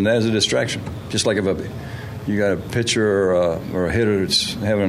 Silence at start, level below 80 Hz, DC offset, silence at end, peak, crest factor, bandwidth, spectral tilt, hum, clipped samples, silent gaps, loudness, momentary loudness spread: 0 s; -44 dBFS; under 0.1%; 0 s; -6 dBFS; 14 dB; 15.5 kHz; -4.5 dB/octave; none; under 0.1%; none; -20 LUFS; 10 LU